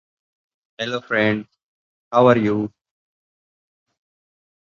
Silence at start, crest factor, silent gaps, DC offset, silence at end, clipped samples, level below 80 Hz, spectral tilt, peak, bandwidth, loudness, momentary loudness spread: 0.8 s; 22 dB; 1.63-2.11 s; under 0.1%; 2.1 s; under 0.1%; -60 dBFS; -7 dB/octave; 0 dBFS; 7.2 kHz; -19 LUFS; 13 LU